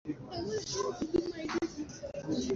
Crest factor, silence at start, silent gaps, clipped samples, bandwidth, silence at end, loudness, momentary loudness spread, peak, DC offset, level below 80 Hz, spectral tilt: 18 dB; 0.05 s; none; under 0.1%; 7.8 kHz; 0 s; -36 LUFS; 8 LU; -18 dBFS; under 0.1%; -58 dBFS; -4.5 dB/octave